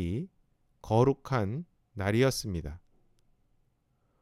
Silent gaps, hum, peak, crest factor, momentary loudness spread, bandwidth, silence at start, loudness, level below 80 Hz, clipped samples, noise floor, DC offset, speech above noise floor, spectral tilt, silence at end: none; none; -10 dBFS; 22 dB; 17 LU; 15.5 kHz; 0 s; -30 LUFS; -52 dBFS; under 0.1%; -73 dBFS; under 0.1%; 44 dB; -6 dB/octave; 1.45 s